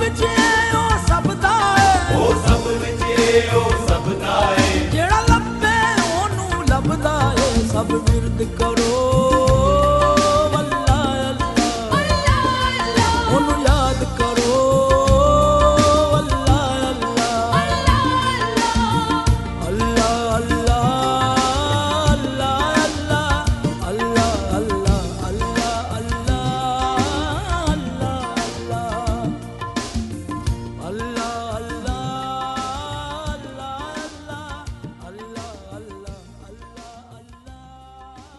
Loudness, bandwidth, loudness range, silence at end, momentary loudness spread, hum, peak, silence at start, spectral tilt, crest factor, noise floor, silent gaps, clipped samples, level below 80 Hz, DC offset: -18 LUFS; 12 kHz; 12 LU; 0.15 s; 13 LU; none; 0 dBFS; 0 s; -5 dB/octave; 18 dB; -43 dBFS; none; under 0.1%; -26 dBFS; under 0.1%